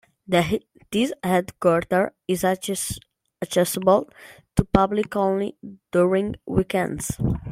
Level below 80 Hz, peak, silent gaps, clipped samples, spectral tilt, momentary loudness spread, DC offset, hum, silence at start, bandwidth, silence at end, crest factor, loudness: -44 dBFS; -2 dBFS; none; under 0.1%; -5.5 dB/octave; 8 LU; under 0.1%; none; 0.3 s; 16.5 kHz; 0 s; 20 dB; -23 LUFS